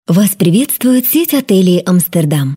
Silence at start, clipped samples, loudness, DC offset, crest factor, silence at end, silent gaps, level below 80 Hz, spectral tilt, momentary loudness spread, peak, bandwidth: 0.1 s; under 0.1%; -11 LUFS; under 0.1%; 10 dB; 0 s; none; -56 dBFS; -5.5 dB/octave; 2 LU; 0 dBFS; 16.5 kHz